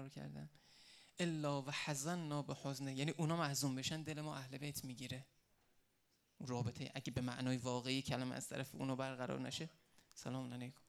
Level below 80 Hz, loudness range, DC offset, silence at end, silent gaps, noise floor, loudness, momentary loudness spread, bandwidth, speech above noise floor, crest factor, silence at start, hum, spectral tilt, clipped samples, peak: -74 dBFS; 5 LU; under 0.1%; 0.15 s; none; -79 dBFS; -44 LUFS; 13 LU; 16 kHz; 36 dB; 20 dB; 0 s; none; -4.5 dB/octave; under 0.1%; -24 dBFS